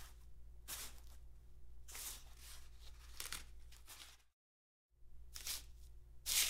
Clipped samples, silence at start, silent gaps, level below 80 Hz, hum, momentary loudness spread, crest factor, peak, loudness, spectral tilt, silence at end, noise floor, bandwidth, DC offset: under 0.1%; 0 s; 4.33-4.89 s; -60 dBFS; none; 18 LU; 28 dB; -20 dBFS; -49 LUFS; 0.5 dB/octave; 0 s; under -90 dBFS; 16 kHz; under 0.1%